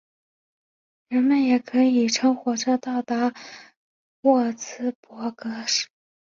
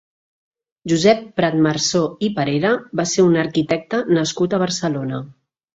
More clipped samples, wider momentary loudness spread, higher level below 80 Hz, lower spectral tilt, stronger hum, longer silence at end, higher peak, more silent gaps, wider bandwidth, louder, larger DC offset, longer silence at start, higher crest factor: neither; first, 12 LU vs 7 LU; second, -72 dBFS vs -58 dBFS; second, -3 dB/octave vs -5 dB/octave; neither; about the same, 0.45 s vs 0.45 s; second, -6 dBFS vs -2 dBFS; first, 3.77-4.23 s, 4.95-5.03 s vs none; about the same, 7.6 kHz vs 8 kHz; second, -23 LUFS vs -18 LUFS; neither; first, 1.1 s vs 0.85 s; about the same, 18 dB vs 18 dB